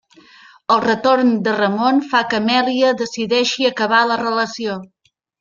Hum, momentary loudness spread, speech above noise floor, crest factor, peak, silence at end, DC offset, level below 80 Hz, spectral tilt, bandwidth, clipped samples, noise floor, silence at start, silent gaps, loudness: none; 7 LU; 30 dB; 16 dB; -2 dBFS; 0.55 s; under 0.1%; -62 dBFS; -4 dB/octave; 7.4 kHz; under 0.1%; -46 dBFS; 0.7 s; none; -16 LUFS